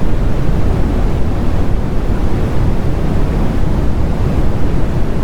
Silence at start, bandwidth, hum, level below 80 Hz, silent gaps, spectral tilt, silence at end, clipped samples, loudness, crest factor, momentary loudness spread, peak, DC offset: 0 s; 8.6 kHz; none; -16 dBFS; none; -8 dB/octave; 0 s; under 0.1%; -17 LUFS; 10 dB; 2 LU; 0 dBFS; under 0.1%